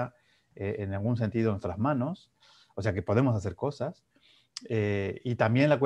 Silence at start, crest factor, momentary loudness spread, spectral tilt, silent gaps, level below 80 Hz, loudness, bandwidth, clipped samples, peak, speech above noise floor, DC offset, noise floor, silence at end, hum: 0 s; 20 dB; 12 LU; -8 dB/octave; none; -60 dBFS; -30 LUFS; 9.4 kHz; under 0.1%; -8 dBFS; 29 dB; under 0.1%; -57 dBFS; 0 s; none